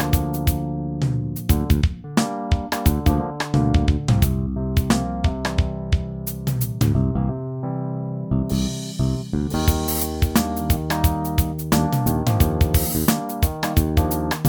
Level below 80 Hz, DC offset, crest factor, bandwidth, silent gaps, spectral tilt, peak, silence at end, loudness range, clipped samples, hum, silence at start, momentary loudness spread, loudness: -26 dBFS; under 0.1%; 18 dB; over 20 kHz; none; -6 dB/octave; -4 dBFS; 0 s; 3 LU; under 0.1%; none; 0 s; 6 LU; -22 LUFS